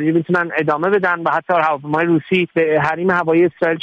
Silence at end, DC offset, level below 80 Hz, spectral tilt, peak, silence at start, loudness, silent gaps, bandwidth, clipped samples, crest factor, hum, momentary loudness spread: 0 s; under 0.1%; -58 dBFS; -8 dB/octave; -4 dBFS; 0 s; -16 LUFS; none; 6.8 kHz; under 0.1%; 14 dB; none; 3 LU